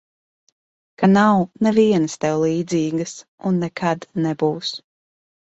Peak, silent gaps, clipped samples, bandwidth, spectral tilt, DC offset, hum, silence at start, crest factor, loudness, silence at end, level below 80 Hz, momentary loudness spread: -2 dBFS; 3.28-3.38 s; under 0.1%; 8.2 kHz; -6 dB/octave; under 0.1%; none; 1 s; 18 dB; -19 LUFS; 0.8 s; -60 dBFS; 12 LU